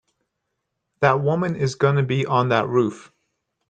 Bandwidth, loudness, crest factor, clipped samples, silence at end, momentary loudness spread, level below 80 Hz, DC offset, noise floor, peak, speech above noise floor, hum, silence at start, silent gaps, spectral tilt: 9 kHz; -21 LUFS; 20 dB; under 0.1%; 0.65 s; 3 LU; -62 dBFS; under 0.1%; -78 dBFS; -2 dBFS; 58 dB; none; 1 s; none; -7 dB/octave